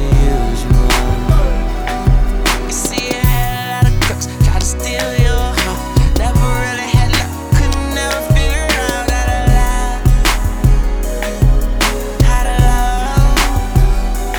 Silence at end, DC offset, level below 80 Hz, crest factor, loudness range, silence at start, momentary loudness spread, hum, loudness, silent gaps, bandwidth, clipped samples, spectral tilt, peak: 0 s; 0.2%; -14 dBFS; 12 dB; 1 LU; 0 s; 4 LU; none; -15 LUFS; none; over 20 kHz; under 0.1%; -4.5 dB/octave; -2 dBFS